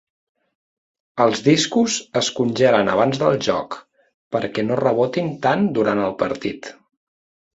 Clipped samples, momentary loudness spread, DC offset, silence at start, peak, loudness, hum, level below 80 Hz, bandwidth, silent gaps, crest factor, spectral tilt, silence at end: under 0.1%; 11 LU; under 0.1%; 1.15 s; -2 dBFS; -19 LUFS; none; -58 dBFS; 8 kHz; 4.14-4.31 s; 18 dB; -4.5 dB/octave; 0.85 s